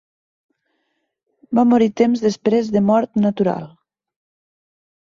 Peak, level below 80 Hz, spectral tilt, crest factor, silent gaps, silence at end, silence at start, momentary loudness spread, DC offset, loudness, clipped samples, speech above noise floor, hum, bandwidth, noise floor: -4 dBFS; -60 dBFS; -7.5 dB/octave; 16 dB; none; 1.35 s; 1.5 s; 6 LU; under 0.1%; -17 LUFS; under 0.1%; 56 dB; none; 7.4 kHz; -72 dBFS